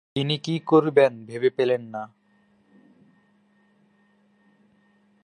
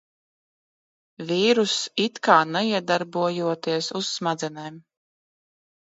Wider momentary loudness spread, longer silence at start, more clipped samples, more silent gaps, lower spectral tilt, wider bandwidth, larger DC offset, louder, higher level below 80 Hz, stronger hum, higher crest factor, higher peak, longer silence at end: first, 17 LU vs 12 LU; second, 0.15 s vs 1.2 s; neither; neither; first, -6.5 dB/octave vs -4 dB/octave; first, 10 kHz vs 8.2 kHz; neither; about the same, -22 LUFS vs -23 LUFS; about the same, -72 dBFS vs -74 dBFS; neither; about the same, 22 dB vs 24 dB; about the same, -4 dBFS vs -2 dBFS; first, 3.2 s vs 1.05 s